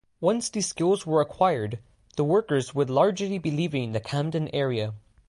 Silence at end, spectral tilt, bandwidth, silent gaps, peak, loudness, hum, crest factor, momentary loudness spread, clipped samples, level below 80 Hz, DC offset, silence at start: 0.3 s; -5.5 dB/octave; 11.5 kHz; none; -8 dBFS; -26 LUFS; none; 18 dB; 8 LU; under 0.1%; -60 dBFS; under 0.1%; 0.2 s